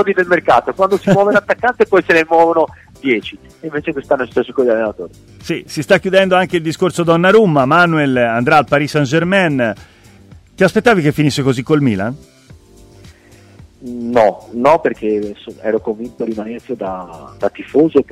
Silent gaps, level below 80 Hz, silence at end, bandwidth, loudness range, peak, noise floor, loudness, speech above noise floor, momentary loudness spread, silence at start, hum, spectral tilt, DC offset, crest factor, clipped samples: none; -48 dBFS; 0.1 s; 15.5 kHz; 6 LU; 0 dBFS; -43 dBFS; -14 LUFS; 29 dB; 14 LU; 0 s; none; -6 dB/octave; under 0.1%; 14 dB; under 0.1%